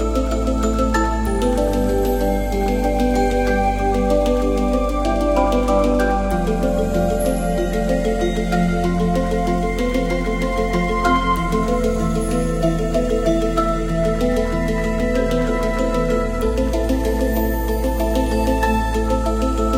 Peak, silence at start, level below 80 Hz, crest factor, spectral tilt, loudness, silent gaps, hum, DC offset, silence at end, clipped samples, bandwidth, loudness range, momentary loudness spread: -4 dBFS; 0 s; -24 dBFS; 14 dB; -6.5 dB/octave; -19 LUFS; none; none; under 0.1%; 0 s; under 0.1%; 16 kHz; 2 LU; 3 LU